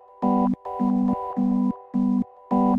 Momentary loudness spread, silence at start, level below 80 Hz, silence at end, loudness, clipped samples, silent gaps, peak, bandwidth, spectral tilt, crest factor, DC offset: 3 LU; 0.2 s; -52 dBFS; 0 s; -24 LUFS; under 0.1%; none; -10 dBFS; 3.5 kHz; -11 dB/octave; 14 dB; under 0.1%